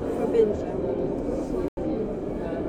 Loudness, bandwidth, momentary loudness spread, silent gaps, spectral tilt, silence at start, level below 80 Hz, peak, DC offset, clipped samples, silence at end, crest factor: -27 LUFS; 10.5 kHz; 8 LU; 1.68-1.77 s; -8.5 dB/octave; 0 s; -42 dBFS; -10 dBFS; under 0.1%; under 0.1%; 0 s; 18 dB